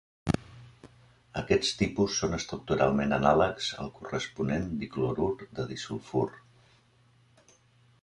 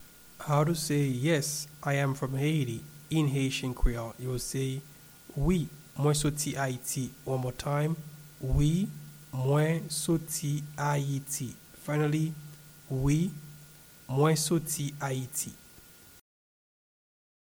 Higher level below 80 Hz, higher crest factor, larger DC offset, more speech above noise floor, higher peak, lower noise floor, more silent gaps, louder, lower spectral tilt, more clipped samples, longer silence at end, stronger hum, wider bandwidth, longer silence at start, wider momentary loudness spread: second, -50 dBFS vs -42 dBFS; about the same, 22 dB vs 18 dB; neither; first, 34 dB vs 25 dB; first, -8 dBFS vs -14 dBFS; first, -63 dBFS vs -54 dBFS; neither; about the same, -30 LUFS vs -31 LUFS; about the same, -5 dB/octave vs -5.5 dB/octave; neither; about the same, 1.65 s vs 1.6 s; neither; second, 11.5 kHz vs over 20 kHz; first, 0.25 s vs 0 s; second, 11 LU vs 14 LU